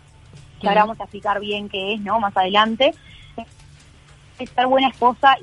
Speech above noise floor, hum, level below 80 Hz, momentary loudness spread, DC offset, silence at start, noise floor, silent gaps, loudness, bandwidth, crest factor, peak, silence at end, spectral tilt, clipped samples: 28 dB; none; -52 dBFS; 21 LU; under 0.1%; 0.35 s; -47 dBFS; none; -19 LUFS; 11 kHz; 18 dB; -2 dBFS; 0.05 s; -5 dB/octave; under 0.1%